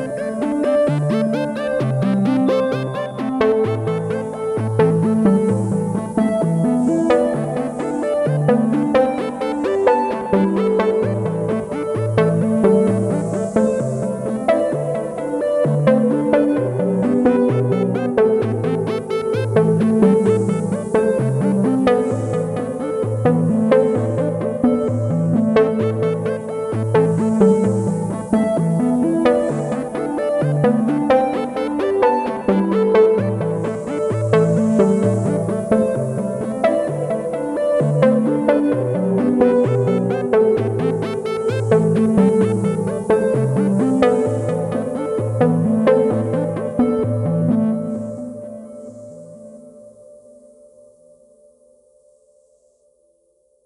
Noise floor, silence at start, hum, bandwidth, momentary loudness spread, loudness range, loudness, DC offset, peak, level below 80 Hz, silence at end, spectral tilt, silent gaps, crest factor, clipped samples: -61 dBFS; 0 s; none; 11.5 kHz; 7 LU; 2 LU; -18 LUFS; under 0.1%; 0 dBFS; -50 dBFS; 3.75 s; -8 dB/octave; none; 16 dB; under 0.1%